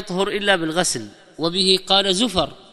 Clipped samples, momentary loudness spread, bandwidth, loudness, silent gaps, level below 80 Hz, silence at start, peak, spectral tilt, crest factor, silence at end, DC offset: under 0.1%; 10 LU; 14 kHz; -19 LUFS; none; -48 dBFS; 0 s; 0 dBFS; -3 dB/octave; 20 dB; 0.15 s; under 0.1%